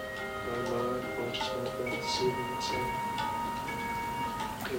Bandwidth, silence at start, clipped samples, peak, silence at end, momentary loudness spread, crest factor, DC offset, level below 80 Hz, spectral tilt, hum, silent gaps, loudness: 16 kHz; 0 s; under 0.1%; -16 dBFS; 0 s; 4 LU; 18 dB; under 0.1%; -54 dBFS; -4 dB/octave; none; none; -33 LUFS